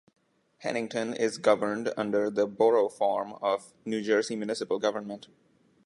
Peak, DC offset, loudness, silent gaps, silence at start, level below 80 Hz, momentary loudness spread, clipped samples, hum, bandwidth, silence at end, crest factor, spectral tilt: -8 dBFS; under 0.1%; -28 LUFS; none; 0.6 s; -76 dBFS; 9 LU; under 0.1%; none; 11.5 kHz; 0.65 s; 20 dB; -4.5 dB/octave